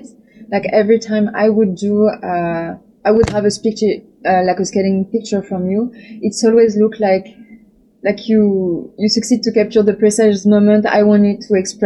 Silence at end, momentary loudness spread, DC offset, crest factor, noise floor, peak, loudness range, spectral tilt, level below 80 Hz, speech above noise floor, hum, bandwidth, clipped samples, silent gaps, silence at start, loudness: 0 s; 9 LU; under 0.1%; 14 dB; -45 dBFS; -2 dBFS; 3 LU; -5.5 dB/octave; -46 dBFS; 32 dB; none; 11.5 kHz; under 0.1%; none; 0.05 s; -15 LUFS